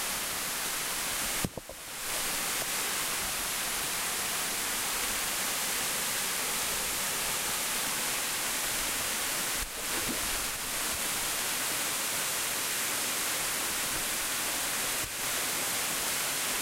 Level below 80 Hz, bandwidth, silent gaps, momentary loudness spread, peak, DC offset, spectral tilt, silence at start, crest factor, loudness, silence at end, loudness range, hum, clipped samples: -54 dBFS; 16 kHz; none; 2 LU; -14 dBFS; under 0.1%; 0 dB/octave; 0 s; 18 dB; -29 LUFS; 0 s; 1 LU; none; under 0.1%